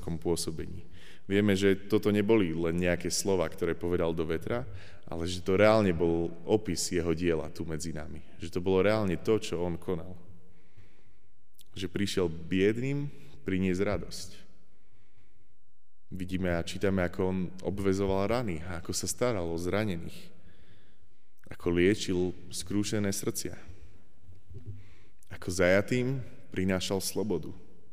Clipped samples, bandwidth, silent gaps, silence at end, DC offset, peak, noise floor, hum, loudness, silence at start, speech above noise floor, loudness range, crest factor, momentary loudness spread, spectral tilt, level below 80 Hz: under 0.1%; 15.5 kHz; none; 0.35 s; 1%; -10 dBFS; -73 dBFS; none; -30 LUFS; 0 s; 43 dB; 7 LU; 20 dB; 17 LU; -5.5 dB/octave; -52 dBFS